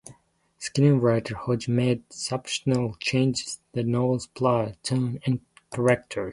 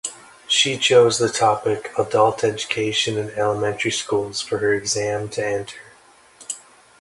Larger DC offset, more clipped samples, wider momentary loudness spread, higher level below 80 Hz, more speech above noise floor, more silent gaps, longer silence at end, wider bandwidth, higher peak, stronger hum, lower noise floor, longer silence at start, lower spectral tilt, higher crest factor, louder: neither; neither; second, 9 LU vs 17 LU; about the same, -56 dBFS vs -58 dBFS; first, 35 dB vs 31 dB; neither; second, 0 s vs 0.4 s; about the same, 11.5 kHz vs 11.5 kHz; second, -6 dBFS vs -2 dBFS; neither; first, -60 dBFS vs -51 dBFS; about the same, 0.05 s vs 0.05 s; first, -6 dB/octave vs -3 dB/octave; about the same, 20 dB vs 18 dB; second, -25 LUFS vs -20 LUFS